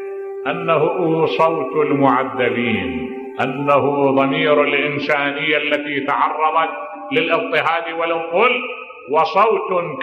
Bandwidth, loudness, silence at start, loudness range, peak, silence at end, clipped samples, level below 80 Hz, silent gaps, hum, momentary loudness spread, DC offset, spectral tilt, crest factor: 7.8 kHz; -17 LUFS; 0 s; 1 LU; -2 dBFS; 0 s; under 0.1%; -58 dBFS; none; none; 8 LU; under 0.1%; -7 dB/octave; 16 dB